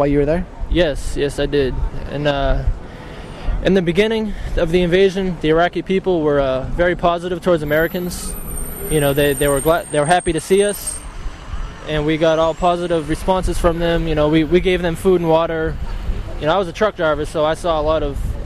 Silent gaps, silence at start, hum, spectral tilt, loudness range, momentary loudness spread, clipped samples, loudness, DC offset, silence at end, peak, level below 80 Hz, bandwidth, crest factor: none; 0 s; none; -5.5 dB/octave; 3 LU; 12 LU; under 0.1%; -18 LUFS; under 0.1%; 0 s; -2 dBFS; -26 dBFS; 13.5 kHz; 16 dB